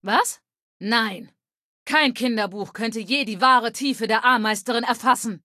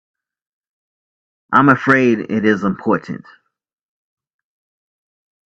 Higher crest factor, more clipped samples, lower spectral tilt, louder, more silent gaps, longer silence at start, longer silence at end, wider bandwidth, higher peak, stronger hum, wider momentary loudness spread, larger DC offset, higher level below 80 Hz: about the same, 20 dB vs 20 dB; neither; second, -2.5 dB/octave vs -7.5 dB/octave; second, -21 LUFS vs -15 LUFS; first, 0.62-0.80 s, 1.63-1.86 s vs none; second, 0.05 s vs 1.5 s; second, 0.05 s vs 2.35 s; first, 14.5 kHz vs 8 kHz; second, -4 dBFS vs 0 dBFS; neither; about the same, 11 LU vs 10 LU; neither; second, -74 dBFS vs -60 dBFS